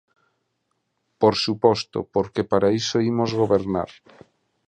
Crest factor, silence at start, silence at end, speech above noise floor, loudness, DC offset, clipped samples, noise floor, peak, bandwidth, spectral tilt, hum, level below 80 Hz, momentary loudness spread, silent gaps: 20 dB; 1.2 s; 0.8 s; 53 dB; -22 LUFS; under 0.1%; under 0.1%; -74 dBFS; -2 dBFS; 9.6 kHz; -5.5 dB/octave; none; -54 dBFS; 6 LU; none